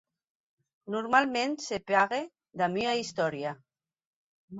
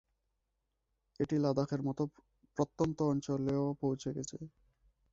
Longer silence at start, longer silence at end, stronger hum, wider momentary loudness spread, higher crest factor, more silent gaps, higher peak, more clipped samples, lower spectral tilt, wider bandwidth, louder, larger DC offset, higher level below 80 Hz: second, 0.85 s vs 1.2 s; second, 0 s vs 0.65 s; neither; about the same, 12 LU vs 12 LU; about the same, 20 dB vs 20 dB; first, 4.05-4.48 s vs none; first, -10 dBFS vs -18 dBFS; neither; second, -4 dB/octave vs -7.5 dB/octave; about the same, 8 kHz vs 7.8 kHz; first, -29 LUFS vs -36 LUFS; neither; second, -72 dBFS vs -64 dBFS